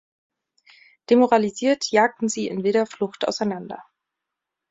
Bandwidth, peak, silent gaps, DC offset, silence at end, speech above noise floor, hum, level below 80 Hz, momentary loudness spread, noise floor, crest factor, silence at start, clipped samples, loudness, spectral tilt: 8 kHz; -4 dBFS; none; under 0.1%; 0.9 s; 63 dB; none; -68 dBFS; 10 LU; -84 dBFS; 20 dB; 1.1 s; under 0.1%; -21 LUFS; -4.5 dB/octave